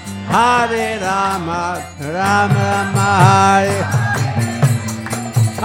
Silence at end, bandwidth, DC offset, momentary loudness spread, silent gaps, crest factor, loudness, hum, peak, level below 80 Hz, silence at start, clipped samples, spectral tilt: 0 s; 16.5 kHz; under 0.1%; 10 LU; none; 16 dB; -15 LUFS; none; 0 dBFS; -48 dBFS; 0 s; under 0.1%; -5.5 dB/octave